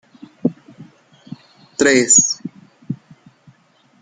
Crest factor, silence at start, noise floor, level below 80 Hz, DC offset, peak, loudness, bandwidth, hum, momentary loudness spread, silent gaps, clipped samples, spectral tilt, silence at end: 20 dB; 0.45 s; -55 dBFS; -64 dBFS; under 0.1%; -2 dBFS; -14 LUFS; 10 kHz; none; 28 LU; none; under 0.1%; -2 dB/octave; 1.05 s